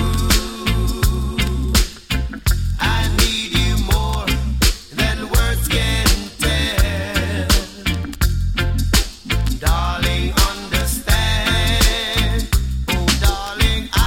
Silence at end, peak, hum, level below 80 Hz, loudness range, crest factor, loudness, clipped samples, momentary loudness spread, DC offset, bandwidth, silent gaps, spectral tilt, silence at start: 0 s; -2 dBFS; none; -20 dBFS; 2 LU; 16 dB; -18 LUFS; under 0.1%; 4 LU; under 0.1%; 17 kHz; none; -3.5 dB/octave; 0 s